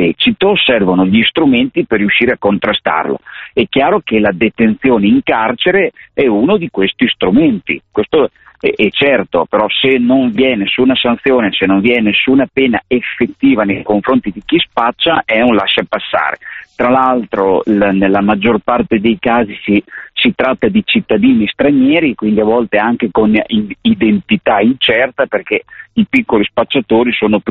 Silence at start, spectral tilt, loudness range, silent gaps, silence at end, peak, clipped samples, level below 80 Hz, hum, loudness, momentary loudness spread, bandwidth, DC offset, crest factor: 0 s; -3 dB/octave; 2 LU; none; 0 s; 0 dBFS; under 0.1%; -44 dBFS; none; -12 LUFS; 5 LU; 4.3 kHz; under 0.1%; 12 dB